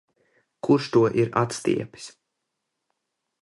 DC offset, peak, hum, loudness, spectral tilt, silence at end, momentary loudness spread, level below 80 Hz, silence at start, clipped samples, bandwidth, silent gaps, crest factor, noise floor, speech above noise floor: under 0.1%; -6 dBFS; none; -23 LUFS; -6 dB/octave; 1.3 s; 19 LU; -62 dBFS; 0.65 s; under 0.1%; 11.5 kHz; none; 20 dB; -81 dBFS; 58 dB